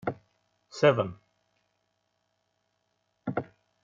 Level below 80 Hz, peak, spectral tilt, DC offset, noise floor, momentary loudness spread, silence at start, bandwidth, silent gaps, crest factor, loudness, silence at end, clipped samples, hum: -72 dBFS; -8 dBFS; -5 dB/octave; under 0.1%; -77 dBFS; 23 LU; 0.05 s; 7.4 kHz; none; 26 dB; -28 LUFS; 0.4 s; under 0.1%; 60 Hz at -65 dBFS